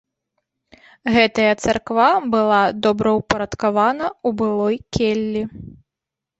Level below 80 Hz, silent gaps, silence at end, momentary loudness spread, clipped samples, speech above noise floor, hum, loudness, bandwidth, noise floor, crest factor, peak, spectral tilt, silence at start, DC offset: -46 dBFS; none; 0.65 s; 7 LU; under 0.1%; 67 dB; none; -18 LUFS; 8.2 kHz; -85 dBFS; 18 dB; -2 dBFS; -5 dB/octave; 1.05 s; under 0.1%